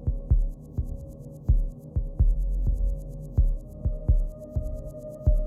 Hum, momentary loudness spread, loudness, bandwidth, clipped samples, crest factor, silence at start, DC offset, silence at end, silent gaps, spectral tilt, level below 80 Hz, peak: none; 10 LU; -30 LUFS; 1.3 kHz; under 0.1%; 14 dB; 0 s; under 0.1%; 0 s; none; -11 dB/octave; -26 dBFS; -10 dBFS